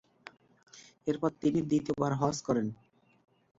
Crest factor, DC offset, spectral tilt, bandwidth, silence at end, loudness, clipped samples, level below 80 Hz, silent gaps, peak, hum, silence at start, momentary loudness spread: 20 dB; under 0.1%; -6.5 dB/octave; 7.8 kHz; 0.85 s; -32 LUFS; under 0.1%; -66 dBFS; none; -14 dBFS; none; 0.75 s; 23 LU